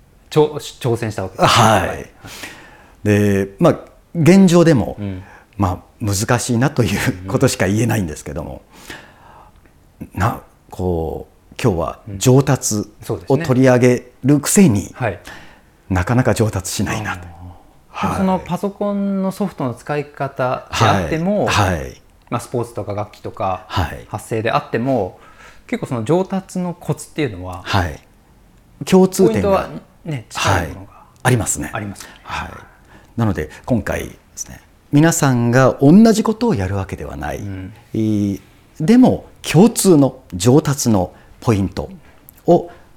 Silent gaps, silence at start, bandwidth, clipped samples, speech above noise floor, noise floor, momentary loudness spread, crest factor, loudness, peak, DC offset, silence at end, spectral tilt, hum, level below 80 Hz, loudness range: none; 0.3 s; 17.5 kHz; under 0.1%; 32 dB; -49 dBFS; 18 LU; 16 dB; -17 LUFS; -2 dBFS; under 0.1%; 0.25 s; -5.5 dB/octave; none; -42 dBFS; 8 LU